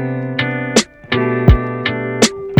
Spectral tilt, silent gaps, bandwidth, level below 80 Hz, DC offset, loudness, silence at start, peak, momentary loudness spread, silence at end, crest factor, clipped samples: -4.5 dB/octave; none; over 20 kHz; -24 dBFS; under 0.1%; -16 LUFS; 0 s; 0 dBFS; 7 LU; 0 s; 16 dB; under 0.1%